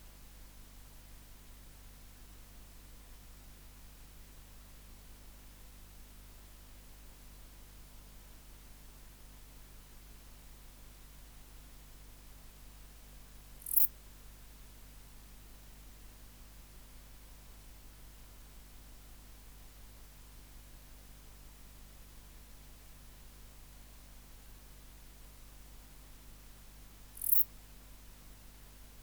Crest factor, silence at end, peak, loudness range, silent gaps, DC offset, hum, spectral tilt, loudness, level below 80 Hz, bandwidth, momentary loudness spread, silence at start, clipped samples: 36 dB; 0 s; -8 dBFS; 20 LU; none; under 0.1%; 50 Hz at -55 dBFS; -2.5 dB/octave; -29 LUFS; -56 dBFS; over 20 kHz; 0 LU; 0 s; under 0.1%